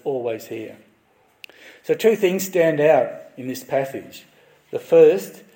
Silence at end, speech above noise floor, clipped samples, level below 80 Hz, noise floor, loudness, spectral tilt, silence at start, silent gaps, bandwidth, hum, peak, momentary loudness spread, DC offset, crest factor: 0.2 s; 40 dB; under 0.1%; -74 dBFS; -60 dBFS; -19 LUFS; -5 dB/octave; 0.05 s; none; 17 kHz; none; -2 dBFS; 20 LU; under 0.1%; 18 dB